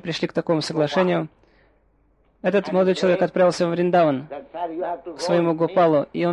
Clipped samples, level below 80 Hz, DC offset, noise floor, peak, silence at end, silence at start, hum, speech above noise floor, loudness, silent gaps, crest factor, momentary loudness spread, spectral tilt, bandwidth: under 0.1%; -62 dBFS; under 0.1%; -61 dBFS; -6 dBFS; 0 s; 0.05 s; none; 41 dB; -21 LUFS; none; 14 dB; 11 LU; -6.5 dB/octave; 11 kHz